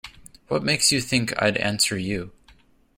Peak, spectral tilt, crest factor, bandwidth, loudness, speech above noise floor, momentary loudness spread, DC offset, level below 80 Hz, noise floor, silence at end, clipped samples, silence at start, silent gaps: -6 dBFS; -3 dB/octave; 20 dB; 16.5 kHz; -22 LUFS; 33 dB; 12 LU; under 0.1%; -52 dBFS; -56 dBFS; 0.7 s; under 0.1%; 0.05 s; none